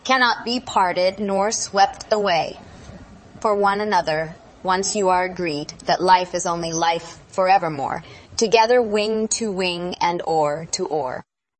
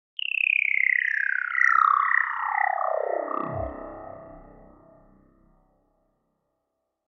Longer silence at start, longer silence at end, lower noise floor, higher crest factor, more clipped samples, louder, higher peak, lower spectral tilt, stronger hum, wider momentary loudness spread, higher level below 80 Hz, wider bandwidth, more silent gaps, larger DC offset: second, 0.05 s vs 0.2 s; second, 0.4 s vs 2.65 s; second, -42 dBFS vs -80 dBFS; about the same, 18 dB vs 20 dB; neither; about the same, -20 LUFS vs -22 LUFS; first, -2 dBFS vs -6 dBFS; second, -3 dB/octave vs -4.5 dB/octave; neither; second, 10 LU vs 20 LU; about the same, -54 dBFS vs -54 dBFS; first, 8.8 kHz vs 7.4 kHz; neither; neither